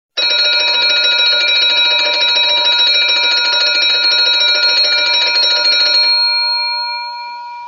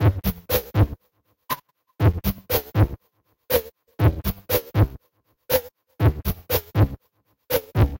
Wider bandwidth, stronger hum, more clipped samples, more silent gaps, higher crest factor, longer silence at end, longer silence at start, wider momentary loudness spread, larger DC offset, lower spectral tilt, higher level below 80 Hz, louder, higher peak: second, 7.2 kHz vs 17 kHz; neither; neither; neither; second, 12 dB vs 18 dB; about the same, 0 s vs 0 s; first, 0.15 s vs 0 s; second, 6 LU vs 10 LU; neither; second, 1 dB/octave vs -6.5 dB/octave; second, -68 dBFS vs -32 dBFS; first, -9 LUFS vs -24 LUFS; first, -2 dBFS vs -6 dBFS